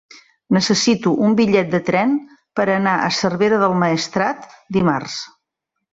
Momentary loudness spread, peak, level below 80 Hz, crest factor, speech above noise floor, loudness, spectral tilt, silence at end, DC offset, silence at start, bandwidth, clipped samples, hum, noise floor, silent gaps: 9 LU; -2 dBFS; -56 dBFS; 16 dB; 61 dB; -17 LUFS; -5 dB/octave; 0.65 s; under 0.1%; 0.5 s; 8 kHz; under 0.1%; none; -78 dBFS; none